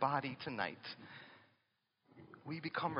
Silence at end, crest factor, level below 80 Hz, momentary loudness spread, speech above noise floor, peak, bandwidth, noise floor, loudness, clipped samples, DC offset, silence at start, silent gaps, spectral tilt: 0 s; 24 dB; -84 dBFS; 20 LU; 42 dB; -20 dBFS; 5.4 kHz; -83 dBFS; -42 LUFS; under 0.1%; under 0.1%; 0 s; none; -3.5 dB/octave